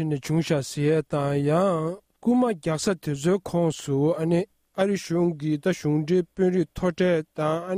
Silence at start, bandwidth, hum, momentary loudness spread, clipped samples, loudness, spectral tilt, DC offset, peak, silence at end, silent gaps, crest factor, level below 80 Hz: 0 s; 15.5 kHz; none; 4 LU; under 0.1%; -25 LUFS; -6.5 dB/octave; under 0.1%; -10 dBFS; 0 s; none; 14 dB; -54 dBFS